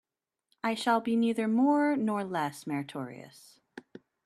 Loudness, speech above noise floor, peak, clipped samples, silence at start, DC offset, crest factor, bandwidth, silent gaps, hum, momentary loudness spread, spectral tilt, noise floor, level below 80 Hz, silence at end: -29 LUFS; 49 dB; -14 dBFS; under 0.1%; 0.65 s; under 0.1%; 18 dB; 13.5 kHz; none; none; 22 LU; -5.5 dB/octave; -78 dBFS; -78 dBFS; 0.45 s